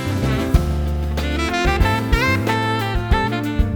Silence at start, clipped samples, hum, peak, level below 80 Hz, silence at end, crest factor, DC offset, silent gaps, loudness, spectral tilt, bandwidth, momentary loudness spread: 0 s; under 0.1%; none; -2 dBFS; -22 dBFS; 0 s; 16 dB; under 0.1%; none; -19 LUFS; -6 dB/octave; 20 kHz; 5 LU